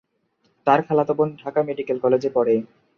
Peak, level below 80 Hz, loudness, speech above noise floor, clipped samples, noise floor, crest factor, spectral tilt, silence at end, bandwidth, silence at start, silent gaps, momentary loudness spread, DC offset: -4 dBFS; -66 dBFS; -21 LUFS; 47 dB; under 0.1%; -67 dBFS; 18 dB; -8 dB/octave; 0.3 s; 6.8 kHz; 0.65 s; none; 6 LU; under 0.1%